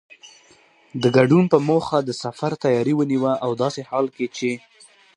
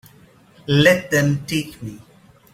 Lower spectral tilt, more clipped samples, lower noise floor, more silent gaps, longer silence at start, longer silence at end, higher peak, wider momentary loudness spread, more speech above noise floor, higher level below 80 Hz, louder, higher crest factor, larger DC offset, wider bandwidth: first, -6.5 dB/octave vs -5 dB/octave; neither; first, -54 dBFS vs -50 dBFS; neither; second, 0.25 s vs 0.7 s; about the same, 0.6 s vs 0.55 s; about the same, 0 dBFS vs -2 dBFS; second, 11 LU vs 21 LU; about the same, 35 dB vs 32 dB; second, -62 dBFS vs -50 dBFS; about the same, -20 LUFS vs -18 LUFS; about the same, 20 dB vs 20 dB; neither; second, 10.5 kHz vs 16 kHz